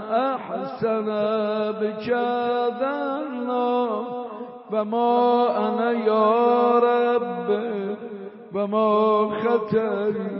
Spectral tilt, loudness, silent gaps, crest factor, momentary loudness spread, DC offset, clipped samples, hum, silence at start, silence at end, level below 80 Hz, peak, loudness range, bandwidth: -4.5 dB/octave; -22 LUFS; none; 14 dB; 11 LU; under 0.1%; under 0.1%; none; 0 s; 0 s; -70 dBFS; -8 dBFS; 4 LU; 5.8 kHz